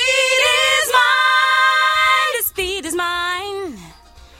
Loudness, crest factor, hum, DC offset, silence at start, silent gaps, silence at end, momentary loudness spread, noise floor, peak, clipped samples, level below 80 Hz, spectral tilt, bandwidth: -15 LUFS; 16 dB; none; under 0.1%; 0 s; none; 0.45 s; 10 LU; -43 dBFS; -2 dBFS; under 0.1%; -48 dBFS; 0 dB/octave; 16.5 kHz